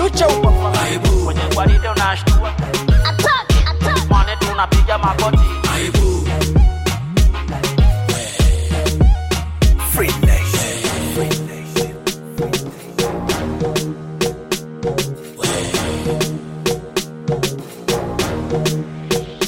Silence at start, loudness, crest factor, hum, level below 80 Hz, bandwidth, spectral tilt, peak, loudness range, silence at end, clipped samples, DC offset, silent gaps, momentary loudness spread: 0 s; -17 LUFS; 12 dB; none; -20 dBFS; 17 kHz; -5 dB/octave; -4 dBFS; 6 LU; 0 s; under 0.1%; under 0.1%; none; 8 LU